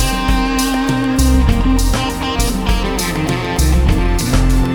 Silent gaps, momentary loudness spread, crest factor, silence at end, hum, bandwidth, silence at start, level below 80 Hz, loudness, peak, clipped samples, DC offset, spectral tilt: none; 4 LU; 14 dB; 0 s; none; 20 kHz; 0 s; -16 dBFS; -15 LUFS; 0 dBFS; under 0.1%; under 0.1%; -5 dB/octave